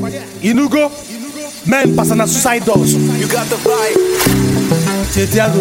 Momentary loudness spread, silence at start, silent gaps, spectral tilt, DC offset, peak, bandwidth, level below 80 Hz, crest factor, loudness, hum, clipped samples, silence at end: 9 LU; 0 s; none; -4.5 dB/octave; under 0.1%; 0 dBFS; 17 kHz; -36 dBFS; 14 dB; -13 LUFS; none; under 0.1%; 0 s